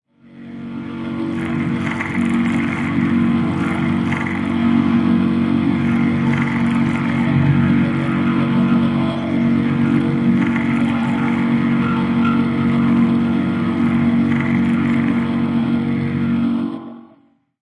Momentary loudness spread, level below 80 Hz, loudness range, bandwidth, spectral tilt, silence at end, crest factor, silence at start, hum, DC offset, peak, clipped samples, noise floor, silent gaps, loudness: 5 LU; -50 dBFS; 2 LU; 10.5 kHz; -8 dB/octave; 0.6 s; 14 dB; 0.3 s; none; under 0.1%; -4 dBFS; under 0.1%; -54 dBFS; none; -17 LUFS